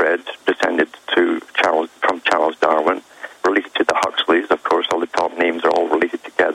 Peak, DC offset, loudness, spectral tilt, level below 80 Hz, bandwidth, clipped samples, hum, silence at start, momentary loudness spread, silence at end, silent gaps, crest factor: -2 dBFS; under 0.1%; -18 LUFS; -3 dB/octave; -62 dBFS; 12.5 kHz; under 0.1%; none; 0 s; 4 LU; 0 s; none; 16 dB